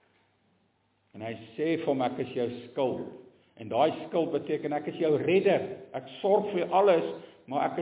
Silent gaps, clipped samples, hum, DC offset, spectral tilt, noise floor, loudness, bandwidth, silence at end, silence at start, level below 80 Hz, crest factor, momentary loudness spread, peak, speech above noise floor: none; under 0.1%; none; under 0.1%; -10 dB/octave; -71 dBFS; -28 LUFS; 4 kHz; 0 s; 1.15 s; -74 dBFS; 18 dB; 15 LU; -10 dBFS; 43 dB